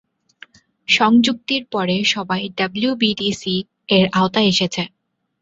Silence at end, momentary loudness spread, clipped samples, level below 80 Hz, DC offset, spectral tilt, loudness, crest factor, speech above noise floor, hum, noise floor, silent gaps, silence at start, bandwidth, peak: 0.55 s; 9 LU; under 0.1%; -56 dBFS; under 0.1%; -4.5 dB/octave; -18 LUFS; 18 dB; 29 dB; none; -47 dBFS; none; 0.9 s; 8 kHz; -2 dBFS